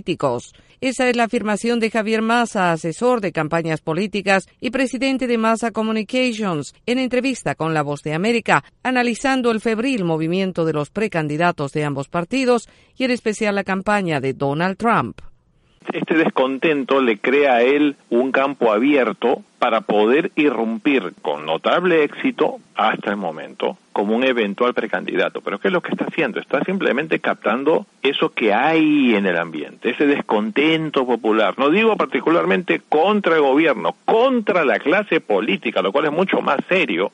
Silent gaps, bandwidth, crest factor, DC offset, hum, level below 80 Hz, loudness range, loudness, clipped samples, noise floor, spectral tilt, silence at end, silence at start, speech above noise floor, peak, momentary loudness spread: none; 11.5 kHz; 18 dB; under 0.1%; none; -58 dBFS; 4 LU; -19 LUFS; under 0.1%; -55 dBFS; -5.5 dB/octave; 0.05 s; 0.05 s; 37 dB; 0 dBFS; 7 LU